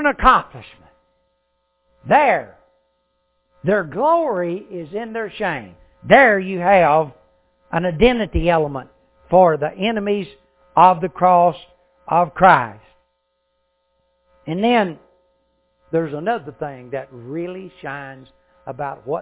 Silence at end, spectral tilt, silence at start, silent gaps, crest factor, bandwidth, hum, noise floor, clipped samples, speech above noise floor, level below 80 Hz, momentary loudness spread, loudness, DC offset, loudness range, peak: 0 s; -9.5 dB/octave; 0 s; none; 20 dB; 4 kHz; none; -69 dBFS; under 0.1%; 52 dB; -40 dBFS; 17 LU; -17 LUFS; under 0.1%; 9 LU; 0 dBFS